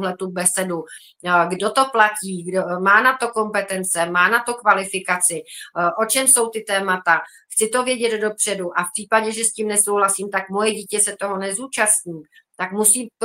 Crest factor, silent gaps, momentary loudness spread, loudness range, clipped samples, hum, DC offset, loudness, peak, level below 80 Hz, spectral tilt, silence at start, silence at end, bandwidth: 20 dB; none; 9 LU; 2 LU; under 0.1%; none; under 0.1%; -18 LUFS; 0 dBFS; -70 dBFS; -2 dB/octave; 0 s; 0 s; 16 kHz